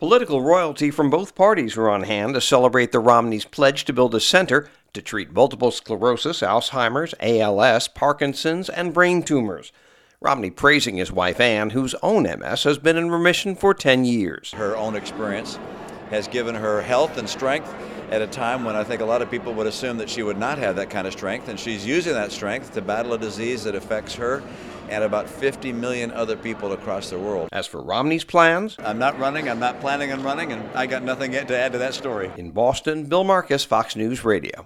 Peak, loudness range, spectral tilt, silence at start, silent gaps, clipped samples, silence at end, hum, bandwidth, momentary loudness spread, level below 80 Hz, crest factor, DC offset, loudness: 0 dBFS; 7 LU; -4.5 dB/octave; 0 s; none; under 0.1%; 0 s; none; 15.5 kHz; 11 LU; -54 dBFS; 20 dB; under 0.1%; -21 LUFS